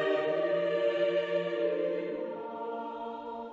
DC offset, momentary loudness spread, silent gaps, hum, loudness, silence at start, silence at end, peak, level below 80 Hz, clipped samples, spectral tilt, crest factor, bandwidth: under 0.1%; 10 LU; none; none; -32 LUFS; 0 s; 0 s; -18 dBFS; -78 dBFS; under 0.1%; -6.5 dB/octave; 14 dB; 7.4 kHz